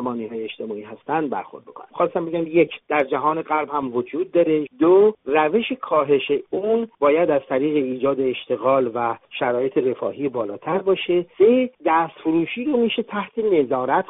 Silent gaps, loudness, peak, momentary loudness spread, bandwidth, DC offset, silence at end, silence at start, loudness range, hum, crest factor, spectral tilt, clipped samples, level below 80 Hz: none; -21 LUFS; -4 dBFS; 10 LU; 4 kHz; under 0.1%; 0.05 s; 0 s; 4 LU; none; 16 dB; -4 dB/octave; under 0.1%; -66 dBFS